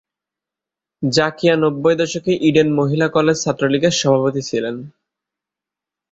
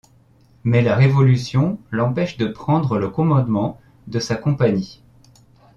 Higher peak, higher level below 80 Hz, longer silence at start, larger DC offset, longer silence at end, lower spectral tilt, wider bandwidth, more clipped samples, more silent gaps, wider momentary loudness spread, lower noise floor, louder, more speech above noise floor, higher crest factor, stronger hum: about the same, -2 dBFS vs -4 dBFS; second, -56 dBFS vs -50 dBFS; first, 1 s vs 0.65 s; neither; first, 1.2 s vs 0.85 s; second, -5 dB/octave vs -7.5 dB/octave; first, 8 kHz vs 7.2 kHz; neither; neither; second, 8 LU vs 11 LU; first, -87 dBFS vs -53 dBFS; about the same, -17 LUFS vs -19 LUFS; first, 70 dB vs 35 dB; about the same, 18 dB vs 16 dB; neither